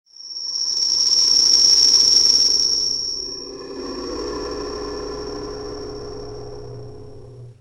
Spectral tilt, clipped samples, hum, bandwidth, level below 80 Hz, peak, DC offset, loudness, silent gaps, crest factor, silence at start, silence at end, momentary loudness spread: -0.5 dB/octave; under 0.1%; none; 16 kHz; -44 dBFS; 0 dBFS; under 0.1%; -13 LUFS; none; 20 dB; 0.2 s; 0.05 s; 23 LU